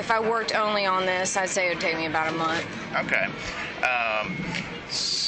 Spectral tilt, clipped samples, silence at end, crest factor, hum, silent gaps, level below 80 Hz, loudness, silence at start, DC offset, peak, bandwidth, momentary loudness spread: -2.5 dB/octave; under 0.1%; 0 s; 16 dB; none; none; -54 dBFS; -25 LUFS; 0 s; under 0.1%; -10 dBFS; 9.4 kHz; 7 LU